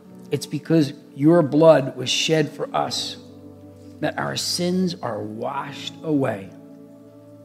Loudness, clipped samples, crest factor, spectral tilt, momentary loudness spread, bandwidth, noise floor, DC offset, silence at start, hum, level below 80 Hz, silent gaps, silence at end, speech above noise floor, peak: -21 LUFS; under 0.1%; 22 dB; -5 dB/octave; 14 LU; 15.5 kHz; -45 dBFS; under 0.1%; 0.1 s; none; -70 dBFS; none; 0 s; 24 dB; 0 dBFS